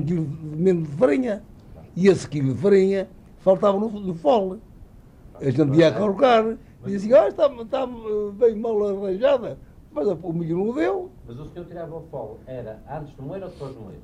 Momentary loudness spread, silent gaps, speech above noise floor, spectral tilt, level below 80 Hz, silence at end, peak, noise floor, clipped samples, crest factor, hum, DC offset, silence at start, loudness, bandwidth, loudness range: 18 LU; none; 25 dB; -7.5 dB/octave; -50 dBFS; 0 s; -6 dBFS; -47 dBFS; under 0.1%; 16 dB; none; under 0.1%; 0 s; -21 LUFS; 10.5 kHz; 8 LU